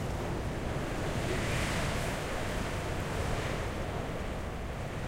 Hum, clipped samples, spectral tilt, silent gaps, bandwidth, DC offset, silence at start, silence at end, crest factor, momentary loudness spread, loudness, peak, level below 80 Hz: none; under 0.1%; -5 dB/octave; none; 16 kHz; under 0.1%; 0 s; 0 s; 14 dB; 6 LU; -35 LUFS; -20 dBFS; -40 dBFS